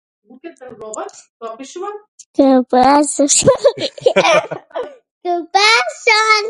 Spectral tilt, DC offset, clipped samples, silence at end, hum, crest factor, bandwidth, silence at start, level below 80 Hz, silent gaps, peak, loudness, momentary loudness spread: -2.5 dB/octave; under 0.1%; under 0.1%; 0 s; none; 16 dB; 11.5 kHz; 0.45 s; -54 dBFS; 1.29-1.40 s, 2.08-2.18 s, 2.26-2.34 s, 5.11-5.21 s; 0 dBFS; -13 LUFS; 21 LU